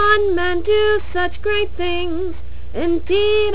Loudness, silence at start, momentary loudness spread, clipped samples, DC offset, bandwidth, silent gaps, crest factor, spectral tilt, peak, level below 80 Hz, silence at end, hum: -19 LUFS; 0 s; 10 LU; under 0.1%; 10%; 4 kHz; none; 14 dB; -9 dB/octave; -2 dBFS; -34 dBFS; 0 s; none